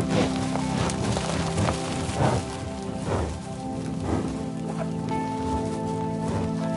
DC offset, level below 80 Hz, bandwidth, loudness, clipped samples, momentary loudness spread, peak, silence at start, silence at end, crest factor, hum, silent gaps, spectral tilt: under 0.1%; -42 dBFS; 11.5 kHz; -28 LUFS; under 0.1%; 7 LU; -8 dBFS; 0 s; 0 s; 18 dB; none; none; -6 dB/octave